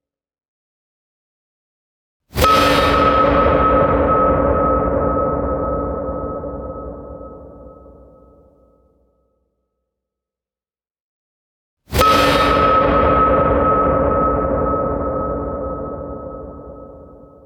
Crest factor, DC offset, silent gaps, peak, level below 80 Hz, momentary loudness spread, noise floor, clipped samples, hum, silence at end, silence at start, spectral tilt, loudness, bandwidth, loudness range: 18 dB; under 0.1%; 11.00-11.77 s; 0 dBFS; -30 dBFS; 19 LU; under -90 dBFS; under 0.1%; none; 0.3 s; 2.35 s; -6 dB/octave; -16 LUFS; 19 kHz; 13 LU